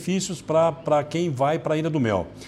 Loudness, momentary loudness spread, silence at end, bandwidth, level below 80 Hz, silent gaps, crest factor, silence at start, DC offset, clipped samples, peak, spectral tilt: -23 LUFS; 5 LU; 0 s; 13.5 kHz; -56 dBFS; none; 14 dB; 0 s; under 0.1%; under 0.1%; -10 dBFS; -6 dB/octave